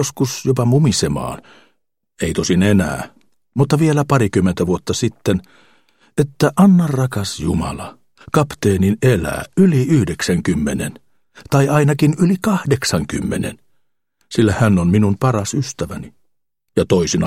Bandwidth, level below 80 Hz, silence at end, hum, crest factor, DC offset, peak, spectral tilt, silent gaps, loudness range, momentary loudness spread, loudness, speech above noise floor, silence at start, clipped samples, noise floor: 16 kHz; -40 dBFS; 0 s; none; 16 dB; under 0.1%; 0 dBFS; -6 dB/octave; none; 2 LU; 11 LU; -17 LUFS; 54 dB; 0 s; under 0.1%; -70 dBFS